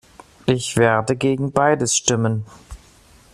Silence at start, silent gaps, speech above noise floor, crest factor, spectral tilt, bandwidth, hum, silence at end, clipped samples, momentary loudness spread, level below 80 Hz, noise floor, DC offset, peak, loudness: 0.45 s; none; 31 dB; 20 dB; -4.5 dB/octave; 13.5 kHz; none; 0.55 s; under 0.1%; 9 LU; -48 dBFS; -50 dBFS; under 0.1%; -2 dBFS; -19 LUFS